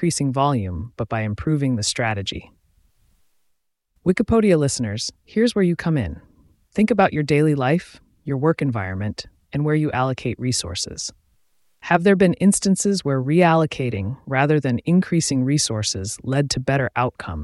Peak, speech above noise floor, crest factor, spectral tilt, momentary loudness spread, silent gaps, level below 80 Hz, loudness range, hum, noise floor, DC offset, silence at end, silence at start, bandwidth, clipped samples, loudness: -2 dBFS; 50 dB; 20 dB; -5.5 dB/octave; 11 LU; none; -46 dBFS; 5 LU; none; -70 dBFS; under 0.1%; 0 s; 0 s; 12 kHz; under 0.1%; -21 LUFS